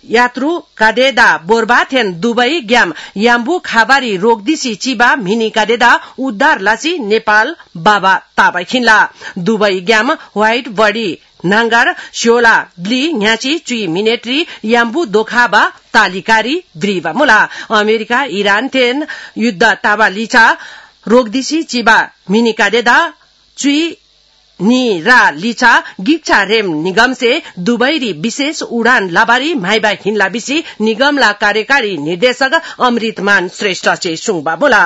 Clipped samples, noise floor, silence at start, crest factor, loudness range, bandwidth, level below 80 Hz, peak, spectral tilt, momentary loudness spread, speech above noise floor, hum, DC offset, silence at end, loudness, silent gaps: 0.5%; -50 dBFS; 0.1 s; 12 dB; 2 LU; 12 kHz; -50 dBFS; 0 dBFS; -3.5 dB/octave; 7 LU; 38 dB; none; under 0.1%; 0 s; -11 LUFS; none